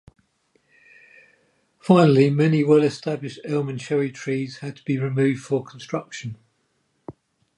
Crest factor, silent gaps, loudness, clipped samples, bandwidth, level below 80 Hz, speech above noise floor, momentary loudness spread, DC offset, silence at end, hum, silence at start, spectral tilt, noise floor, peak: 20 dB; none; -21 LUFS; under 0.1%; 11 kHz; -66 dBFS; 49 dB; 16 LU; under 0.1%; 0.45 s; none; 1.85 s; -7.5 dB/octave; -69 dBFS; -4 dBFS